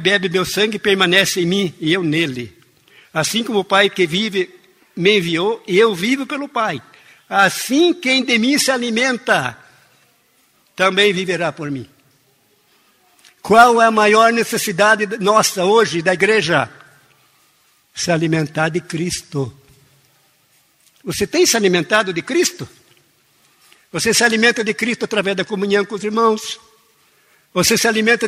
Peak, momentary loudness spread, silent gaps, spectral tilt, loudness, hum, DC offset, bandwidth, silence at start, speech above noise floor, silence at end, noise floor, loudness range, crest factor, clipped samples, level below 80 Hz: 0 dBFS; 13 LU; none; -3.5 dB/octave; -16 LUFS; none; under 0.1%; 16 kHz; 0 s; 42 dB; 0 s; -58 dBFS; 7 LU; 18 dB; under 0.1%; -56 dBFS